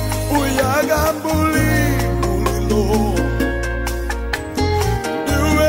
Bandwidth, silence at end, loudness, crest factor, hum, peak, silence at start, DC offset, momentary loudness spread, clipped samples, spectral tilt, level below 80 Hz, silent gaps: 16.5 kHz; 0 s; -18 LUFS; 12 dB; none; -6 dBFS; 0 s; under 0.1%; 7 LU; under 0.1%; -5.5 dB/octave; -24 dBFS; none